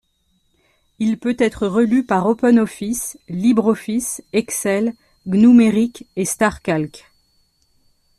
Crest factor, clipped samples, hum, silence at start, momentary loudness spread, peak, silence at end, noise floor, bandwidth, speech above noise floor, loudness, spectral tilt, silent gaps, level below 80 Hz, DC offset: 16 dB; under 0.1%; none; 1 s; 11 LU; -2 dBFS; 1.2 s; -64 dBFS; 13.5 kHz; 48 dB; -18 LUFS; -5.5 dB/octave; none; -52 dBFS; under 0.1%